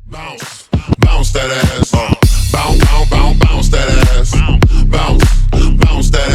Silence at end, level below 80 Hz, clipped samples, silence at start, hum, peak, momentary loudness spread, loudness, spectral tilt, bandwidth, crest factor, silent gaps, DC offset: 0 s; -10 dBFS; under 0.1%; 0.05 s; none; 0 dBFS; 6 LU; -12 LUFS; -5.5 dB/octave; 14 kHz; 8 dB; none; under 0.1%